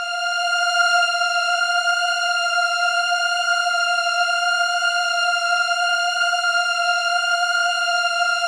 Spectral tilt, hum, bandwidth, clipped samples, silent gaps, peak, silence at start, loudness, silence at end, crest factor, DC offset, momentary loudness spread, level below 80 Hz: 7 dB/octave; none; 13.5 kHz; under 0.1%; none; -6 dBFS; 0 s; -18 LUFS; 0 s; 14 dB; under 0.1%; 2 LU; under -90 dBFS